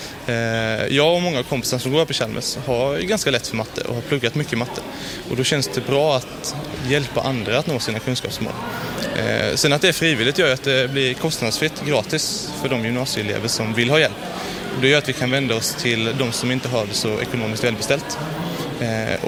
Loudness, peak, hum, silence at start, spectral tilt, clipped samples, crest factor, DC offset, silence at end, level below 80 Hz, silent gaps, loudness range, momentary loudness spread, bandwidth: -20 LUFS; -2 dBFS; none; 0 s; -4 dB/octave; under 0.1%; 18 dB; under 0.1%; 0 s; -48 dBFS; none; 4 LU; 10 LU; 18.5 kHz